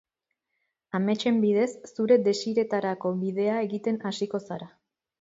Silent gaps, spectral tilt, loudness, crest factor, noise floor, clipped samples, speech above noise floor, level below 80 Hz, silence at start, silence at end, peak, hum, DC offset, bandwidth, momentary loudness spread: none; -6 dB/octave; -26 LUFS; 18 dB; -82 dBFS; under 0.1%; 56 dB; -74 dBFS; 0.95 s; 0.55 s; -10 dBFS; none; under 0.1%; 7.8 kHz; 10 LU